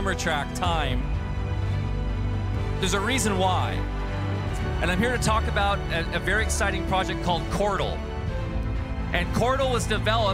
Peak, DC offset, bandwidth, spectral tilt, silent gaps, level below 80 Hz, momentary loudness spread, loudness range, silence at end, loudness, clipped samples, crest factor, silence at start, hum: -8 dBFS; under 0.1%; 15.5 kHz; -5 dB/octave; none; -32 dBFS; 7 LU; 2 LU; 0 s; -26 LUFS; under 0.1%; 16 dB; 0 s; none